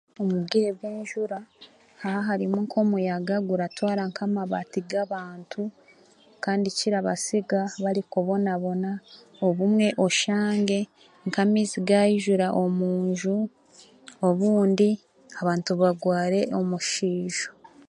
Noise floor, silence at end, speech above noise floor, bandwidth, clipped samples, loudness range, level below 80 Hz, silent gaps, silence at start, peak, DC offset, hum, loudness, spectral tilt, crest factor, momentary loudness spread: -56 dBFS; 0.35 s; 32 dB; 11.5 kHz; under 0.1%; 5 LU; -72 dBFS; none; 0.2 s; -8 dBFS; under 0.1%; none; -25 LUFS; -5.5 dB/octave; 18 dB; 11 LU